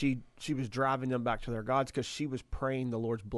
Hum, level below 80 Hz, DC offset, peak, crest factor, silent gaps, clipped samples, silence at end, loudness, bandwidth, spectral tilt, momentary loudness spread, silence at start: none; -52 dBFS; under 0.1%; -18 dBFS; 16 dB; none; under 0.1%; 0 s; -34 LUFS; 12 kHz; -6 dB/octave; 6 LU; 0 s